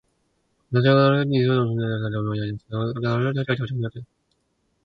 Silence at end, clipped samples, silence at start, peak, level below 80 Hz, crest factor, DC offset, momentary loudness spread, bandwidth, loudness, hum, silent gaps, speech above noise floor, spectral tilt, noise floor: 0.8 s; under 0.1%; 0.7 s; -4 dBFS; -56 dBFS; 20 dB; under 0.1%; 12 LU; 5.2 kHz; -23 LUFS; none; none; 49 dB; -9 dB/octave; -70 dBFS